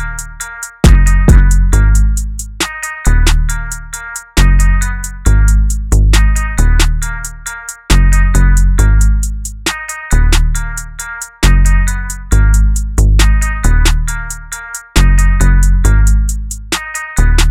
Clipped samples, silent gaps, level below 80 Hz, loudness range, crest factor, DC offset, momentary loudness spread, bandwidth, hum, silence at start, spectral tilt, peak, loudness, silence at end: 0.4%; none; -10 dBFS; 2 LU; 10 dB; under 0.1%; 13 LU; 15 kHz; none; 0 s; -4.5 dB/octave; 0 dBFS; -13 LUFS; 0 s